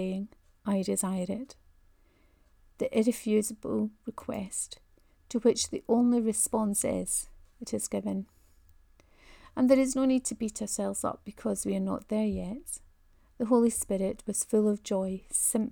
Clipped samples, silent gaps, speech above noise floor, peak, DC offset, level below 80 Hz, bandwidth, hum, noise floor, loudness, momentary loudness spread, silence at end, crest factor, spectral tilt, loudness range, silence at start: under 0.1%; none; 34 dB; -10 dBFS; under 0.1%; -58 dBFS; over 20 kHz; none; -64 dBFS; -30 LUFS; 14 LU; 0 s; 20 dB; -4.5 dB/octave; 4 LU; 0 s